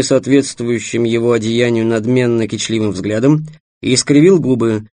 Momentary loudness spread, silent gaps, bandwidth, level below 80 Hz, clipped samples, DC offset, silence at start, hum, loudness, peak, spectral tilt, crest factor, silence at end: 8 LU; 3.60-3.81 s; 10 kHz; -52 dBFS; under 0.1%; under 0.1%; 0 s; none; -14 LUFS; 0 dBFS; -5.5 dB/octave; 14 dB; 0.05 s